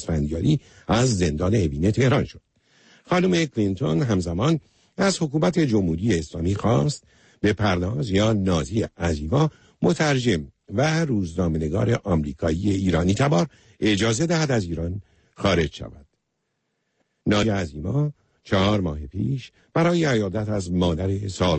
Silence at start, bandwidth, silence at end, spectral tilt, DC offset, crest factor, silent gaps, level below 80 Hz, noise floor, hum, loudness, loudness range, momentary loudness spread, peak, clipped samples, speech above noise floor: 0 s; 8.8 kHz; 0 s; -6 dB/octave; under 0.1%; 14 dB; none; -40 dBFS; -76 dBFS; none; -23 LUFS; 3 LU; 7 LU; -8 dBFS; under 0.1%; 54 dB